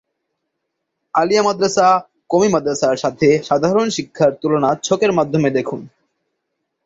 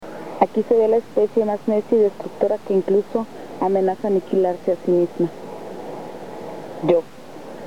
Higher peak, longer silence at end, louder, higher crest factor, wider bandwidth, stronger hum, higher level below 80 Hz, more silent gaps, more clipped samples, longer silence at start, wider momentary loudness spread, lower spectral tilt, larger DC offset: about the same, -2 dBFS vs 0 dBFS; first, 1 s vs 0 s; first, -16 LUFS vs -20 LUFS; about the same, 16 dB vs 20 dB; second, 8 kHz vs 13.5 kHz; neither; first, -56 dBFS vs -68 dBFS; neither; neither; first, 1.15 s vs 0 s; second, 6 LU vs 16 LU; second, -5 dB/octave vs -8 dB/octave; second, under 0.1% vs 0.8%